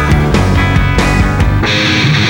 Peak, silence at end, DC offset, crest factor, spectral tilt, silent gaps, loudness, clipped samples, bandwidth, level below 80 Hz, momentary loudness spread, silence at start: 0 dBFS; 0 s; under 0.1%; 10 dB; -5.5 dB/octave; none; -11 LUFS; under 0.1%; 17.5 kHz; -16 dBFS; 2 LU; 0 s